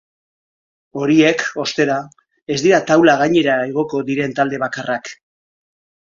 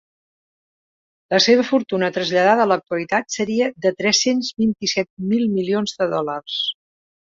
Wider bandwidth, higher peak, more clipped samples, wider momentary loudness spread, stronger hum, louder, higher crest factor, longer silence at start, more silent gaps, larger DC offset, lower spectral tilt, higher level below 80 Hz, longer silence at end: about the same, 7.6 kHz vs 7.8 kHz; about the same, 0 dBFS vs -2 dBFS; neither; first, 11 LU vs 8 LU; neither; first, -16 LUFS vs -19 LUFS; about the same, 18 dB vs 18 dB; second, 0.95 s vs 1.3 s; about the same, 2.42-2.46 s vs 5.10-5.17 s; neither; first, -5 dB/octave vs -3.5 dB/octave; about the same, -60 dBFS vs -62 dBFS; first, 0.9 s vs 0.65 s